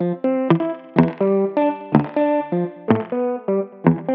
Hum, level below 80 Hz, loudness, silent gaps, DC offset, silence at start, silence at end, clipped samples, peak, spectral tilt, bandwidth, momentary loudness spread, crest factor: none; -56 dBFS; -20 LUFS; none; under 0.1%; 0 s; 0 s; under 0.1%; 0 dBFS; -8 dB/octave; 5.4 kHz; 5 LU; 18 dB